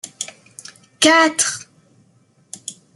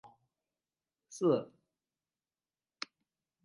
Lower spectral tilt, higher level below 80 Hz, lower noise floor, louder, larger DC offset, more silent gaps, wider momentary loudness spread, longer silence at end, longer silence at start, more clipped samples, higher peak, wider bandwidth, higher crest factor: second, -0.5 dB/octave vs -6 dB/octave; first, -68 dBFS vs under -90 dBFS; second, -57 dBFS vs under -90 dBFS; first, -14 LUFS vs -33 LUFS; neither; neither; first, 26 LU vs 21 LU; second, 0.25 s vs 2 s; about the same, 0.05 s vs 0.05 s; neither; first, 0 dBFS vs -18 dBFS; first, 12.5 kHz vs 11 kHz; about the same, 22 dB vs 22 dB